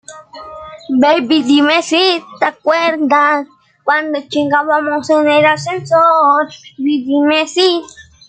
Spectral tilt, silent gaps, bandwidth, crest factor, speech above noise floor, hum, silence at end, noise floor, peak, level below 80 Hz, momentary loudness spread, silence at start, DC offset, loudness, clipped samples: -4 dB/octave; none; 9.2 kHz; 12 dB; 20 dB; none; 0.25 s; -33 dBFS; -2 dBFS; -60 dBFS; 12 LU; 0.1 s; under 0.1%; -13 LUFS; under 0.1%